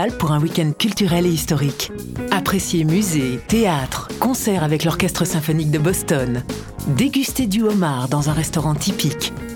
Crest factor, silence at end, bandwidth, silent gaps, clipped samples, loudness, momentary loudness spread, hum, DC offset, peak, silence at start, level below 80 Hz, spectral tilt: 16 dB; 0 s; 19 kHz; none; under 0.1%; -19 LUFS; 5 LU; none; under 0.1%; -2 dBFS; 0 s; -38 dBFS; -5 dB/octave